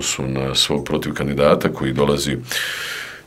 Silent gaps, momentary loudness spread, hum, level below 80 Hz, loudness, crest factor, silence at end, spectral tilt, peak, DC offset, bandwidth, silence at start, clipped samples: none; 7 LU; none; -40 dBFS; -19 LUFS; 20 dB; 0.05 s; -4 dB/octave; 0 dBFS; under 0.1%; 16 kHz; 0 s; under 0.1%